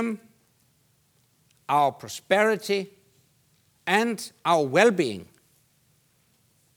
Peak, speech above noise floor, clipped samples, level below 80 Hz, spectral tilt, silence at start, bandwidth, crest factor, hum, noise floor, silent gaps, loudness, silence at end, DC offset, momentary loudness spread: -4 dBFS; 42 dB; under 0.1%; -78 dBFS; -4.5 dB/octave; 0 s; over 20 kHz; 24 dB; none; -66 dBFS; none; -24 LUFS; 1.55 s; under 0.1%; 18 LU